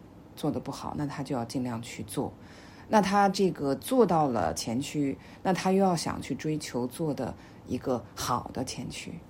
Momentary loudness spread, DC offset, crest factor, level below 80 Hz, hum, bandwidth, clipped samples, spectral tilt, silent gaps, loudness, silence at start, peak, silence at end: 13 LU; under 0.1%; 20 dB; -58 dBFS; none; 16 kHz; under 0.1%; -5.5 dB/octave; none; -30 LUFS; 0 s; -10 dBFS; 0 s